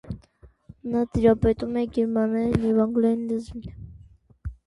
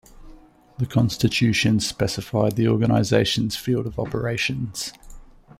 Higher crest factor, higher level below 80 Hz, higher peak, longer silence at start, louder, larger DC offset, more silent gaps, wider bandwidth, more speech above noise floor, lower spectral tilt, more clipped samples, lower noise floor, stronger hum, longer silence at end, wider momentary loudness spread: about the same, 18 dB vs 18 dB; about the same, -42 dBFS vs -46 dBFS; about the same, -6 dBFS vs -4 dBFS; about the same, 0.05 s vs 0.15 s; about the same, -23 LUFS vs -22 LUFS; neither; neither; second, 11 kHz vs 16 kHz; first, 32 dB vs 26 dB; first, -9 dB/octave vs -5.5 dB/octave; neither; first, -54 dBFS vs -47 dBFS; neither; second, 0.15 s vs 0.4 s; first, 20 LU vs 9 LU